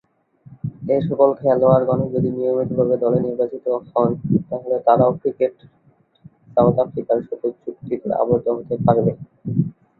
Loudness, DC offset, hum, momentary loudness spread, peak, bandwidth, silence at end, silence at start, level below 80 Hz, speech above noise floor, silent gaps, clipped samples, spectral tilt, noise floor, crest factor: -19 LUFS; under 0.1%; none; 11 LU; -2 dBFS; 4.2 kHz; 0.3 s; 0.5 s; -52 dBFS; 34 dB; none; under 0.1%; -12.5 dB/octave; -52 dBFS; 18 dB